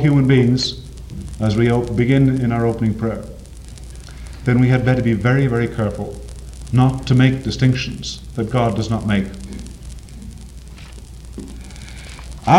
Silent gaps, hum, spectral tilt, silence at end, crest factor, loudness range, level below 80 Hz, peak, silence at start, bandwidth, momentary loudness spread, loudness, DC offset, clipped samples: none; none; -7 dB/octave; 0 s; 18 dB; 7 LU; -34 dBFS; 0 dBFS; 0 s; 11 kHz; 22 LU; -18 LUFS; under 0.1%; under 0.1%